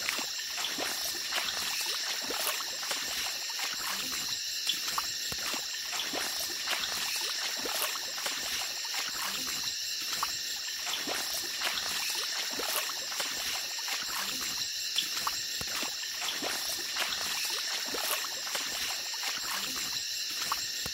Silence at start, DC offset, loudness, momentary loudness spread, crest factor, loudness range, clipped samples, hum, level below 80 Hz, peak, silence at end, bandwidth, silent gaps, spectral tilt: 0 s; under 0.1%; -31 LUFS; 2 LU; 24 dB; 0 LU; under 0.1%; none; -68 dBFS; -10 dBFS; 0 s; 16 kHz; none; 1 dB/octave